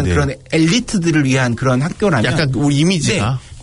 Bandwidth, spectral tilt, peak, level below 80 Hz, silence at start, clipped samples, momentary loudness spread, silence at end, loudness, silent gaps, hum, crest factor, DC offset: 11 kHz; -5.5 dB/octave; -4 dBFS; -38 dBFS; 0 s; under 0.1%; 4 LU; 0 s; -15 LUFS; none; none; 12 dB; under 0.1%